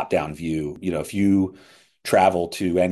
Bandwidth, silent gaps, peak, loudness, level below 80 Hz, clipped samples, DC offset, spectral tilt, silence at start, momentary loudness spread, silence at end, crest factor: 12.5 kHz; none; -4 dBFS; -22 LUFS; -46 dBFS; under 0.1%; under 0.1%; -6 dB/octave; 0 s; 9 LU; 0 s; 18 dB